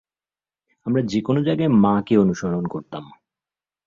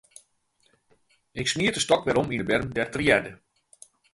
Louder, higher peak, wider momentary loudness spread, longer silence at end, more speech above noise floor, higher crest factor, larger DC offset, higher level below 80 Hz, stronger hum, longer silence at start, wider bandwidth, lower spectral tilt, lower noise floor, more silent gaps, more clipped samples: first, -20 LUFS vs -24 LUFS; about the same, -4 dBFS vs -4 dBFS; first, 16 LU vs 7 LU; about the same, 0.8 s vs 0.8 s; first, over 70 dB vs 44 dB; second, 18 dB vs 24 dB; neither; about the same, -54 dBFS vs -52 dBFS; neither; second, 0.85 s vs 1.35 s; second, 7.4 kHz vs 11.5 kHz; first, -8 dB/octave vs -4 dB/octave; first, under -90 dBFS vs -68 dBFS; neither; neither